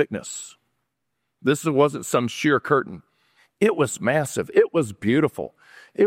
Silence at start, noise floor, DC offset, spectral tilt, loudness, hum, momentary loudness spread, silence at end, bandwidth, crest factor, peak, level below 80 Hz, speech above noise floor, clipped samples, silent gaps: 0 s; -78 dBFS; under 0.1%; -5 dB/octave; -22 LUFS; none; 16 LU; 0 s; 16 kHz; 18 dB; -4 dBFS; -64 dBFS; 57 dB; under 0.1%; none